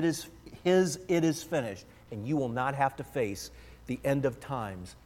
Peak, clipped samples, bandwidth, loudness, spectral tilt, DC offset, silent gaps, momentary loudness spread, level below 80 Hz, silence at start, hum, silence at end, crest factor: -12 dBFS; under 0.1%; 16.5 kHz; -31 LUFS; -5.5 dB/octave; under 0.1%; none; 16 LU; -58 dBFS; 0 s; none; 0.1 s; 18 dB